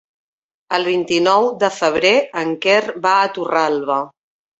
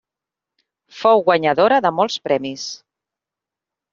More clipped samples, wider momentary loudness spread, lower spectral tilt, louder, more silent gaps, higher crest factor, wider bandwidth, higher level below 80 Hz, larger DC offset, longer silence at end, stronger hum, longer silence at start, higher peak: neither; second, 7 LU vs 15 LU; about the same, -3.5 dB/octave vs -2.5 dB/octave; about the same, -16 LUFS vs -17 LUFS; neither; about the same, 16 dB vs 18 dB; about the same, 8.2 kHz vs 7.6 kHz; first, -60 dBFS vs -66 dBFS; neither; second, 0.5 s vs 1.15 s; neither; second, 0.7 s vs 0.95 s; about the same, -2 dBFS vs -2 dBFS